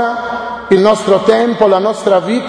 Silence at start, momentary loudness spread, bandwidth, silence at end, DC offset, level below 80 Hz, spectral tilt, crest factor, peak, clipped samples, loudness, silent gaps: 0 s; 9 LU; 10.5 kHz; 0 s; under 0.1%; -48 dBFS; -5.5 dB/octave; 12 dB; 0 dBFS; 0.2%; -12 LUFS; none